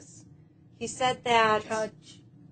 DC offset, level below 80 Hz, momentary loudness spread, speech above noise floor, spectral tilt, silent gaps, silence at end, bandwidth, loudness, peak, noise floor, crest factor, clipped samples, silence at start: under 0.1%; -66 dBFS; 15 LU; 28 dB; -3 dB/octave; none; 0.4 s; 9.4 kHz; -27 LUFS; -8 dBFS; -55 dBFS; 20 dB; under 0.1%; 0 s